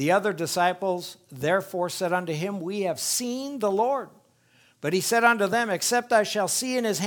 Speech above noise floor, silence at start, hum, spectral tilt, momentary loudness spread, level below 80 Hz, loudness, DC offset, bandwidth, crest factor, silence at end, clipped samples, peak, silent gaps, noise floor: 36 dB; 0 s; none; -3.5 dB/octave; 10 LU; -72 dBFS; -25 LUFS; under 0.1%; 19.5 kHz; 20 dB; 0 s; under 0.1%; -6 dBFS; none; -61 dBFS